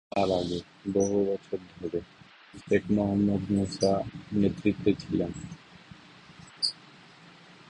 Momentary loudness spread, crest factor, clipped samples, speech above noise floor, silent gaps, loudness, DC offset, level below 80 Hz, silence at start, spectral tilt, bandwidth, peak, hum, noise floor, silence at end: 19 LU; 20 dB; under 0.1%; 25 dB; none; -29 LUFS; under 0.1%; -54 dBFS; 0.15 s; -6 dB/octave; 10.5 kHz; -10 dBFS; none; -53 dBFS; 0.95 s